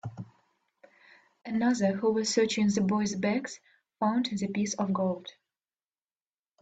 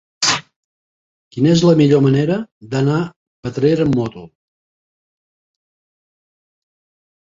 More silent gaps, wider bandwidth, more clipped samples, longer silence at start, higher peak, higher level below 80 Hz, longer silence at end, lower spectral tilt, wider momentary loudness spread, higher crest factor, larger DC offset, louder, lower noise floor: second, none vs 0.56-1.31 s, 2.52-2.61 s, 3.16-3.43 s; about the same, 9 kHz vs 8.2 kHz; neither; second, 0.05 s vs 0.2 s; second, -12 dBFS vs -2 dBFS; second, -70 dBFS vs -52 dBFS; second, 1.3 s vs 3.15 s; about the same, -5 dB/octave vs -5.5 dB/octave; first, 19 LU vs 15 LU; about the same, 18 dB vs 18 dB; neither; second, -29 LUFS vs -16 LUFS; about the same, under -90 dBFS vs under -90 dBFS